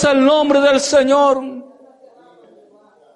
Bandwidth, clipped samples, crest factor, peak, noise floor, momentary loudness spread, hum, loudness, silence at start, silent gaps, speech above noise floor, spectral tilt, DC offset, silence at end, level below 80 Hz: 11.5 kHz; under 0.1%; 12 dB; -4 dBFS; -50 dBFS; 14 LU; none; -13 LUFS; 0 s; none; 37 dB; -3.5 dB/octave; under 0.1%; 1.5 s; -54 dBFS